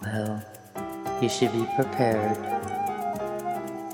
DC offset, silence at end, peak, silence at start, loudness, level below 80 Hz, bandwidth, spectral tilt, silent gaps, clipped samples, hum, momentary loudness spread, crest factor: under 0.1%; 0 s; -8 dBFS; 0 s; -28 LUFS; -62 dBFS; 19.5 kHz; -5.5 dB/octave; none; under 0.1%; none; 11 LU; 18 dB